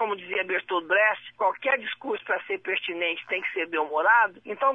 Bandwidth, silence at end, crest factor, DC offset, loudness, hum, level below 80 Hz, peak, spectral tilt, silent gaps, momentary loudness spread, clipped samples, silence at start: 7.4 kHz; 0 s; 18 dB; under 0.1%; -25 LUFS; none; -76 dBFS; -8 dBFS; -4.5 dB/octave; none; 8 LU; under 0.1%; 0 s